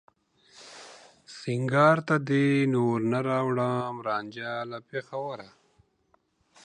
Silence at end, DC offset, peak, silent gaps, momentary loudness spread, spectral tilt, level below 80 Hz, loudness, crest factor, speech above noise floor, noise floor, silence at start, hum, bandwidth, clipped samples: 1.2 s; under 0.1%; -8 dBFS; none; 24 LU; -7 dB/octave; -74 dBFS; -27 LUFS; 20 dB; 43 dB; -69 dBFS; 0.6 s; none; 9.8 kHz; under 0.1%